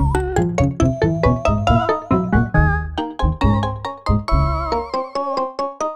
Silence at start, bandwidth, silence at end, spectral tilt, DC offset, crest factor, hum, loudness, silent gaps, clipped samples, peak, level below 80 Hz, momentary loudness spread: 0 s; 10 kHz; 0 s; -7 dB/octave; 0.4%; 16 dB; none; -19 LUFS; none; under 0.1%; -2 dBFS; -24 dBFS; 6 LU